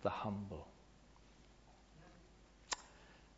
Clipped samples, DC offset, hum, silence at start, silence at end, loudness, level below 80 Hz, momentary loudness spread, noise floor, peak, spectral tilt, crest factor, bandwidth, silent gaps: under 0.1%; under 0.1%; none; 0 s; 0 s; -46 LUFS; -66 dBFS; 22 LU; -65 dBFS; -24 dBFS; -4 dB/octave; 26 dB; 7.6 kHz; none